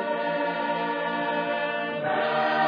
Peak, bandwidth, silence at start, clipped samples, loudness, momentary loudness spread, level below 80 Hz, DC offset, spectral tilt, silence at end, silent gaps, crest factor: -14 dBFS; 5.2 kHz; 0 s; under 0.1%; -27 LUFS; 3 LU; -90 dBFS; under 0.1%; -7 dB/octave; 0 s; none; 14 dB